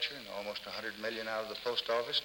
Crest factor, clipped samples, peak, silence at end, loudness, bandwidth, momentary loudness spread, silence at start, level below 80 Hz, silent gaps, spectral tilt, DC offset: 18 dB; under 0.1%; -20 dBFS; 0 s; -37 LUFS; over 20 kHz; 8 LU; 0 s; -72 dBFS; none; -2.5 dB/octave; under 0.1%